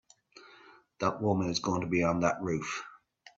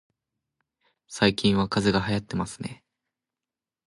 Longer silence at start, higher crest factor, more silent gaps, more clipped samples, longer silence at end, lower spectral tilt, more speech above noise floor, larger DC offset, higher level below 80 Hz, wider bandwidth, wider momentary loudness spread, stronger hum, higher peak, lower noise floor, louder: second, 0.35 s vs 1.1 s; about the same, 22 dB vs 22 dB; neither; neither; second, 0.4 s vs 1.15 s; about the same, -5.5 dB/octave vs -5.5 dB/octave; second, 28 dB vs over 65 dB; neither; second, -62 dBFS vs -52 dBFS; second, 7.8 kHz vs 11.5 kHz; second, 9 LU vs 16 LU; neither; second, -12 dBFS vs -6 dBFS; second, -58 dBFS vs under -90 dBFS; second, -31 LUFS vs -25 LUFS